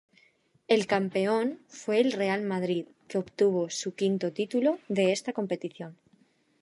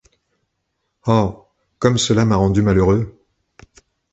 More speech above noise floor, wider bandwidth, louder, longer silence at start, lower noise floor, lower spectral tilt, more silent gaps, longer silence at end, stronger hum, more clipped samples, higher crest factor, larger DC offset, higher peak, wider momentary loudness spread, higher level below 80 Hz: second, 38 dB vs 58 dB; first, 11.5 kHz vs 8.2 kHz; second, -28 LUFS vs -17 LUFS; second, 0.7 s vs 1.05 s; second, -66 dBFS vs -73 dBFS; about the same, -5 dB/octave vs -6 dB/octave; neither; second, 0.7 s vs 1.05 s; neither; neither; about the same, 18 dB vs 18 dB; neither; second, -10 dBFS vs -2 dBFS; about the same, 9 LU vs 9 LU; second, -78 dBFS vs -38 dBFS